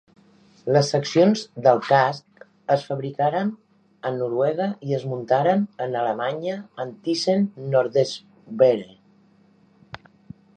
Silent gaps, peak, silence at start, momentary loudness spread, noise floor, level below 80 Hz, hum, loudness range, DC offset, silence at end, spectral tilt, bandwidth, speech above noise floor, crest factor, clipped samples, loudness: none; -4 dBFS; 0.65 s; 15 LU; -57 dBFS; -70 dBFS; none; 3 LU; under 0.1%; 0.6 s; -6 dB/octave; 9.4 kHz; 36 dB; 20 dB; under 0.1%; -22 LUFS